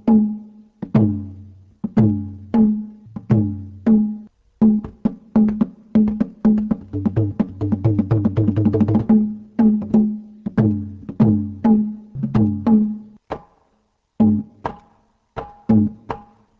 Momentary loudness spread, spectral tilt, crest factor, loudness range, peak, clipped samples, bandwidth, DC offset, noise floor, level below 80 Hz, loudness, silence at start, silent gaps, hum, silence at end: 16 LU; -11.5 dB/octave; 16 dB; 3 LU; -2 dBFS; under 0.1%; 3.4 kHz; under 0.1%; -65 dBFS; -42 dBFS; -19 LUFS; 0.05 s; none; none; 0.4 s